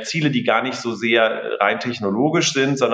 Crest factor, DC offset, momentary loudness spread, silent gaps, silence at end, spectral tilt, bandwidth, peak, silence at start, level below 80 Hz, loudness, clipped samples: 18 dB; under 0.1%; 6 LU; none; 0 s; -4 dB/octave; 9.4 kHz; -2 dBFS; 0 s; -70 dBFS; -19 LUFS; under 0.1%